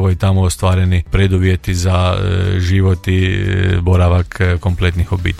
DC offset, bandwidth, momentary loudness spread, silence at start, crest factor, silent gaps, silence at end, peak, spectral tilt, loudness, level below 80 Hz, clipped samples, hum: under 0.1%; 12.5 kHz; 3 LU; 0 s; 12 dB; none; 0 s; 0 dBFS; -6.5 dB/octave; -14 LUFS; -28 dBFS; under 0.1%; none